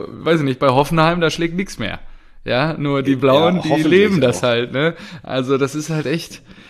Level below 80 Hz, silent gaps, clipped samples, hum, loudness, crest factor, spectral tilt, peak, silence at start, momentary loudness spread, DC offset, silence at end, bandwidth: -42 dBFS; none; under 0.1%; none; -17 LUFS; 16 dB; -6 dB/octave; -2 dBFS; 0 s; 11 LU; under 0.1%; 0.2 s; 13.5 kHz